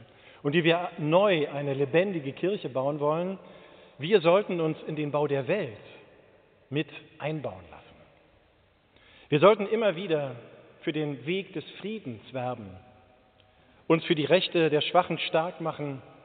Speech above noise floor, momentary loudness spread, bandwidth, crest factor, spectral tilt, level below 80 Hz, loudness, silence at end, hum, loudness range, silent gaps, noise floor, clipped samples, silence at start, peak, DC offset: 37 dB; 15 LU; 4.6 kHz; 22 dB; -4 dB/octave; -72 dBFS; -27 LUFS; 0.15 s; none; 9 LU; none; -64 dBFS; under 0.1%; 0 s; -6 dBFS; under 0.1%